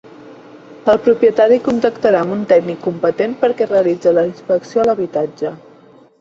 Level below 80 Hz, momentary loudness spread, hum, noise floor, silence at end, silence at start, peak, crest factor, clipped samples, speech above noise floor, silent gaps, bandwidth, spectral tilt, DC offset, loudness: -56 dBFS; 8 LU; none; -45 dBFS; 0.65 s; 0.2 s; 0 dBFS; 16 dB; under 0.1%; 31 dB; none; 7.6 kHz; -7 dB/octave; under 0.1%; -15 LUFS